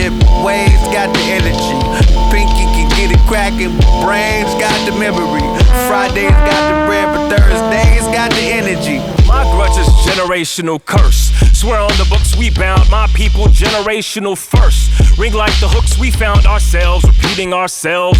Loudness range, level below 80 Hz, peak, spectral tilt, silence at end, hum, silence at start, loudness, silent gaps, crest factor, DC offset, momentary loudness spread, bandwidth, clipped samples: 1 LU; -12 dBFS; 0 dBFS; -5 dB/octave; 0 s; none; 0 s; -12 LUFS; none; 10 dB; under 0.1%; 4 LU; 15.5 kHz; under 0.1%